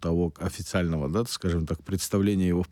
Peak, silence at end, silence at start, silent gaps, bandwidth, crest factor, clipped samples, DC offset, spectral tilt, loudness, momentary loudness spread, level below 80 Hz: -14 dBFS; 0.05 s; 0 s; none; 17 kHz; 14 dB; under 0.1%; under 0.1%; -6 dB/octave; -27 LUFS; 6 LU; -42 dBFS